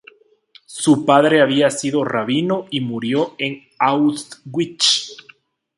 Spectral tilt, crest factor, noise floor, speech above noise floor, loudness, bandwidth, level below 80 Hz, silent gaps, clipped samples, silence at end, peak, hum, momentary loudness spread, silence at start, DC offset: -4 dB/octave; 18 dB; -51 dBFS; 34 dB; -17 LUFS; 11.5 kHz; -64 dBFS; none; under 0.1%; 0.6 s; 0 dBFS; none; 12 LU; 0.7 s; under 0.1%